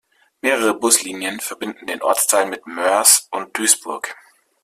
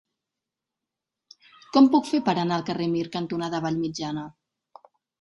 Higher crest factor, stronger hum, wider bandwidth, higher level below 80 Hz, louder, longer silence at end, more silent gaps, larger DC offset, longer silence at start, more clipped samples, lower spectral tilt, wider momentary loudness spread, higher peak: about the same, 20 dB vs 20 dB; neither; first, 16 kHz vs 11.5 kHz; about the same, -68 dBFS vs -66 dBFS; first, -17 LUFS vs -24 LUFS; second, 0.5 s vs 0.9 s; neither; neither; second, 0.45 s vs 1.75 s; neither; second, 0 dB/octave vs -6 dB/octave; about the same, 15 LU vs 13 LU; first, 0 dBFS vs -6 dBFS